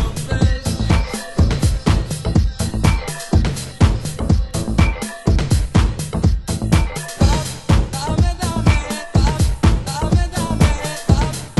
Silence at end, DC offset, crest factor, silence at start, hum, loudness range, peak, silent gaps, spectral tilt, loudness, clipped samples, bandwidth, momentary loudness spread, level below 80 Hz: 0.05 s; under 0.1%; 16 dB; 0 s; none; 1 LU; 0 dBFS; none; -5.5 dB/octave; -18 LUFS; under 0.1%; 12.5 kHz; 4 LU; -20 dBFS